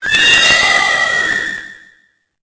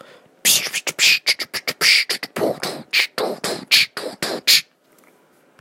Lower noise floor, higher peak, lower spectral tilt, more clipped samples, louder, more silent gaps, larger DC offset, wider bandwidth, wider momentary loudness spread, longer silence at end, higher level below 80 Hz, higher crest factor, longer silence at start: about the same, -55 dBFS vs -56 dBFS; about the same, 0 dBFS vs 0 dBFS; about the same, 0 dB/octave vs 0 dB/octave; neither; first, -9 LUFS vs -17 LUFS; neither; neither; second, 8 kHz vs 16.5 kHz; first, 13 LU vs 10 LU; second, 0.7 s vs 1 s; first, -44 dBFS vs -68 dBFS; second, 14 dB vs 20 dB; second, 0 s vs 0.45 s